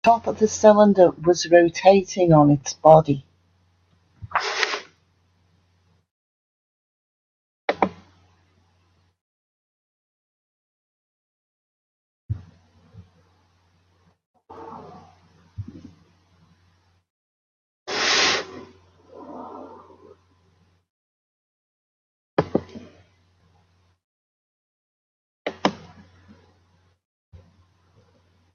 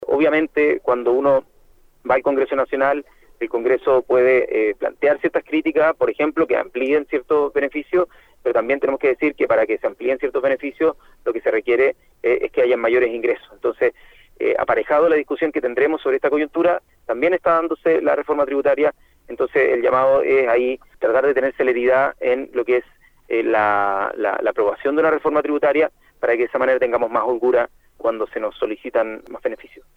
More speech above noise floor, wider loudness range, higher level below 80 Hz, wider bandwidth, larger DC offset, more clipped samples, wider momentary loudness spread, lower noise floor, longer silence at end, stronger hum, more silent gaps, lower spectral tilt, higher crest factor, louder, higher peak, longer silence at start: first, 47 dB vs 33 dB; first, 27 LU vs 2 LU; second, -60 dBFS vs -54 dBFS; first, 7.4 kHz vs 5.2 kHz; neither; neither; first, 26 LU vs 8 LU; first, -64 dBFS vs -52 dBFS; first, 2.8 s vs 0.4 s; neither; first, 6.11-7.68 s, 9.21-12.29 s, 14.26-14.34 s, 17.10-17.86 s, 20.90-22.37 s, 24.04-25.45 s vs none; second, -5 dB/octave vs -7 dB/octave; first, 24 dB vs 16 dB; about the same, -19 LUFS vs -19 LUFS; first, 0 dBFS vs -4 dBFS; about the same, 0.05 s vs 0 s